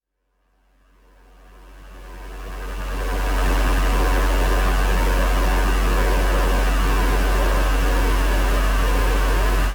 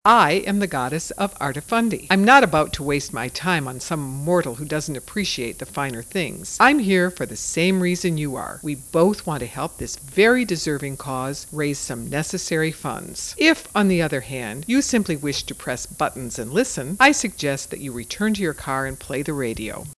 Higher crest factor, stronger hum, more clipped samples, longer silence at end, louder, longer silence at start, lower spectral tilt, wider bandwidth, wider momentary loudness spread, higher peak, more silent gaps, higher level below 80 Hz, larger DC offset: second, 12 dB vs 22 dB; neither; neither; about the same, 0 s vs 0.05 s; about the same, -21 LUFS vs -21 LUFS; first, 1.7 s vs 0.05 s; about the same, -5 dB/octave vs -4.5 dB/octave; first, over 20 kHz vs 11 kHz; about the same, 11 LU vs 12 LU; second, -8 dBFS vs 0 dBFS; neither; first, -20 dBFS vs -48 dBFS; neither